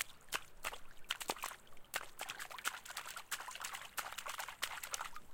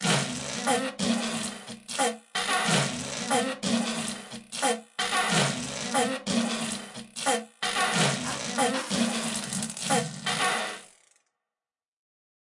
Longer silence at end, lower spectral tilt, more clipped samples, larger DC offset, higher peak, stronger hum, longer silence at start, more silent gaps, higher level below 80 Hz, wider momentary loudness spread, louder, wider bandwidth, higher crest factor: second, 0 s vs 1.6 s; second, 0.5 dB/octave vs -3 dB/octave; neither; neither; second, -18 dBFS vs -10 dBFS; neither; about the same, 0 s vs 0 s; neither; about the same, -64 dBFS vs -66 dBFS; second, 5 LU vs 9 LU; second, -44 LUFS vs -27 LUFS; first, 17 kHz vs 11.5 kHz; first, 28 dB vs 18 dB